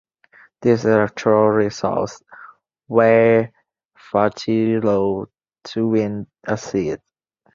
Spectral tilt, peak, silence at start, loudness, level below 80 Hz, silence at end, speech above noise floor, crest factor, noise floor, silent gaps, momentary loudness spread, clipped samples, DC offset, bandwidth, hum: -7 dB/octave; -2 dBFS; 0.6 s; -19 LUFS; -54 dBFS; 0.6 s; 46 dB; 18 dB; -63 dBFS; 3.85-3.89 s; 15 LU; under 0.1%; under 0.1%; 7.4 kHz; none